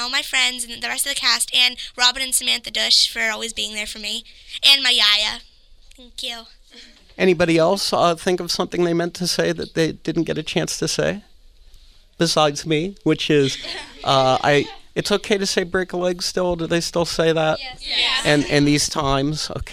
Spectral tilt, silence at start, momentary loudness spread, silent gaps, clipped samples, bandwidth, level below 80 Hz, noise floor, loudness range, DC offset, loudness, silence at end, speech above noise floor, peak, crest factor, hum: -3 dB/octave; 0 s; 11 LU; none; under 0.1%; 16 kHz; -44 dBFS; -47 dBFS; 5 LU; under 0.1%; -19 LUFS; 0 s; 27 dB; 0 dBFS; 20 dB; none